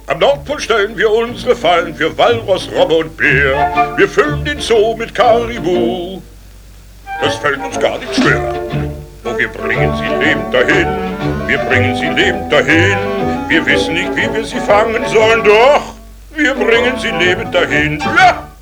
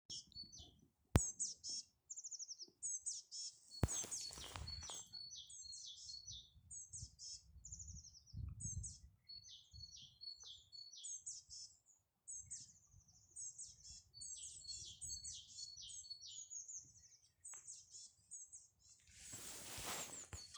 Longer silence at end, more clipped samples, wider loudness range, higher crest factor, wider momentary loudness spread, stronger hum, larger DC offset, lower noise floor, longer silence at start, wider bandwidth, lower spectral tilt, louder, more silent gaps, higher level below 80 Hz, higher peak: about the same, 0.05 s vs 0 s; neither; second, 5 LU vs 8 LU; second, 14 dB vs 36 dB; second, 8 LU vs 15 LU; neither; neither; second, -36 dBFS vs -77 dBFS; about the same, 0 s vs 0.1 s; about the same, over 20 kHz vs over 20 kHz; first, -5 dB/octave vs -2.5 dB/octave; first, -13 LUFS vs -49 LUFS; neither; first, -34 dBFS vs -60 dBFS; first, 0 dBFS vs -14 dBFS